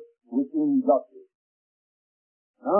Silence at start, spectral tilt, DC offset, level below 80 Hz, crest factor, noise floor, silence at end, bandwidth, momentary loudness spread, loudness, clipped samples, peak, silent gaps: 0 s; -14 dB/octave; under 0.1%; -90 dBFS; 20 dB; under -90 dBFS; 0 s; 1.5 kHz; 9 LU; -25 LUFS; under 0.1%; -8 dBFS; 1.35-2.54 s